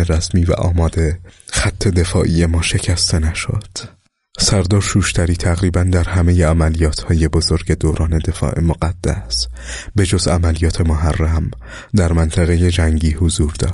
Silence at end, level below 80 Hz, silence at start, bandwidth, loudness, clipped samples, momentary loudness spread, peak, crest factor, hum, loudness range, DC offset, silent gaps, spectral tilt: 0 s; -22 dBFS; 0 s; 11.5 kHz; -16 LUFS; under 0.1%; 7 LU; -2 dBFS; 14 dB; none; 2 LU; under 0.1%; none; -5 dB/octave